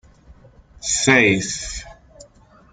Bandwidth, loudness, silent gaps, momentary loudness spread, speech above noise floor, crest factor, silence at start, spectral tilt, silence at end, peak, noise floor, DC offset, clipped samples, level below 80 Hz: 9.6 kHz; -17 LUFS; none; 17 LU; 32 dB; 20 dB; 0.3 s; -3 dB/octave; 0.8 s; -2 dBFS; -50 dBFS; under 0.1%; under 0.1%; -44 dBFS